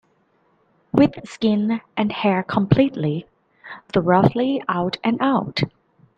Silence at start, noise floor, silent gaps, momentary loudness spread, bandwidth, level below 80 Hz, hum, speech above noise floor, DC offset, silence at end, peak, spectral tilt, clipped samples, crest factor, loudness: 0.95 s; -62 dBFS; none; 8 LU; 8.6 kHz; -50 dBFS; none; 43 dB; under 0.1%; 0.5 s; -2 dBFS; -8 dB/octave; under 0.1%; 20 dB; -20 LUFS